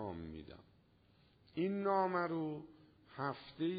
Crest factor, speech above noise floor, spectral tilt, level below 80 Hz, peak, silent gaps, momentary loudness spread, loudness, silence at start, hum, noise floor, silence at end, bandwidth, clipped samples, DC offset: 18 dB; 32 dB; -5.5 dB/octave; -68 dBFS; -24 dBFS; none; 22 LU; -39 LUFS; 0 s; none; -70 dBFS; 0 s; 4.9 kHz; under 0.1%; under 0.1%